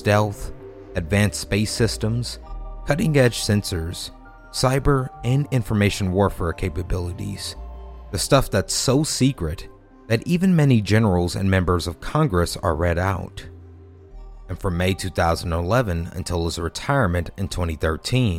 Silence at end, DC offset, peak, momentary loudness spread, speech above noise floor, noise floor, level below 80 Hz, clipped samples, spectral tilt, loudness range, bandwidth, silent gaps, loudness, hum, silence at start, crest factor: 0 s; under 0.1%; -2 dBFS; 13 LU; 23 dB; -44 dBFS; -36 dBFS; under 0.1%; -5.5 dB/octave; 4 LU; 16.5 kHz; none; -22 LUFS; none; 0 s; 20 dB